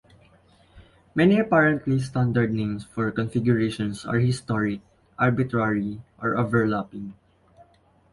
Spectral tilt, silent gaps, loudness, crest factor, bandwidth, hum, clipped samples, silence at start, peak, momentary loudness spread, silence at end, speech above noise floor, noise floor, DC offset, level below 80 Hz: -7.5 dB/octave; none; -24 LUFS; 18 dB; 11.5 kHz; none; under 0.1%; 0.75 s; -6 dBFS; 11 LU; 1 s; 36 dB; -59 dBFS; under 0.1%; -54 dBFS